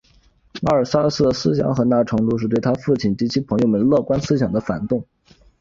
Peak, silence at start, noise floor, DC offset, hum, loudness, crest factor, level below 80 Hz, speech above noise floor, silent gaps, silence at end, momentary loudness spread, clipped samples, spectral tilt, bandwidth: -2 dBFS; 0.55 s; -55 dBFS; under 0.1%; none; -19 LUFS; 16 dB; -46 dBFS; 37 dB; none; 0.55 s; 6 LU; under 0.1%; -7 dB/octave; 7.6 kHz